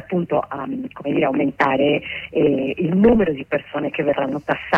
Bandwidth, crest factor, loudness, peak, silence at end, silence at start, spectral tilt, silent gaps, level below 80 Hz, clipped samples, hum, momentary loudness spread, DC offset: 6.6 kHz; 16 dB; -20 LUFS; -4 dBFS; 0 s; 0 s; -8 dB/octave; none; -44 dBFS; under 0.1%; none; 10 LU; under 0.1%